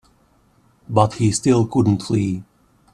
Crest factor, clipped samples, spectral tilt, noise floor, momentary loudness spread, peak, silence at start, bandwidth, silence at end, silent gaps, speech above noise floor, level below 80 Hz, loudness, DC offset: 20 dB; under 0.1%; -6.5 dB/octave; -58 dBFS; 7 LU; 0 dBFS; 0.9 s; 12 kHz; 0.5 s; none; 40 dB; -52 dBFS; -19 LUFS; under 0.1%